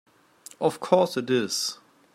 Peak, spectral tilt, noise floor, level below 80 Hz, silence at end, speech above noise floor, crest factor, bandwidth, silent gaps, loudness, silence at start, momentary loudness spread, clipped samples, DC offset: -6 dBFS; -4 dB/octave; -51 dBFS; -76 dBFS; 0.4 s; 27 dB; 22 dB; 16 kHz; none; -25 LUFS; 0.6 s; 7 LU; under 0.1%; under 0.1%